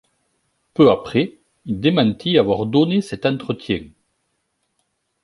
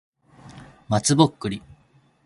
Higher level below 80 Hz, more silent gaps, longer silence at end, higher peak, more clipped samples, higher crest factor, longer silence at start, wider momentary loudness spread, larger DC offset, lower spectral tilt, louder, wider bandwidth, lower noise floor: about the same, -52 dBFS vs -54 dBFS; neither; first, 1.35 s vs 0.7 s; about the same, -2 dBFS vs -2 dBFS; neither; second, 18 dB vs 24 dB; first, 0.8 s vs 0.45 s; about the same, 12 LU vs 14 LU; neither; first, -7.5 dB/octave vs -5 dB/octave; about the same, -19 LUFS vs -21 LUFS; about the same, 11.5 kHz vs 11.5 kHz; first, -71 dBFS vs -59 dBFS